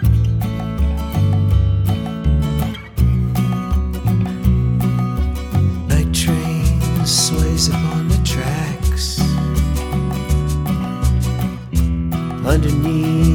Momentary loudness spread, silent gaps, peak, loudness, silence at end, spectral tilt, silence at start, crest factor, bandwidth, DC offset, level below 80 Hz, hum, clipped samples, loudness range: 5 LU; none; -2 dBFS; -18 LUFS; 0 s; -5.5 dB/octave; 0 s; 14 dB; 19 kHz; under 0.1%; -22 dBFS; none; under 0.1%; 2 LU